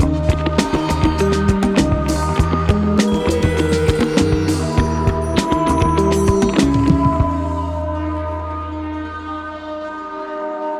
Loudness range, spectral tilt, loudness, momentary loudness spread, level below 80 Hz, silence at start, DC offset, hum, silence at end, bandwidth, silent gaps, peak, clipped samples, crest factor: 5 LU; -6.5 dB/octave; -18 LUFS; 12 LU; -26 dBFS; 0 s; under 0.1%; none; 0 s; 14 kHz; none; 0 dBFS; under 0.1%; 16 dB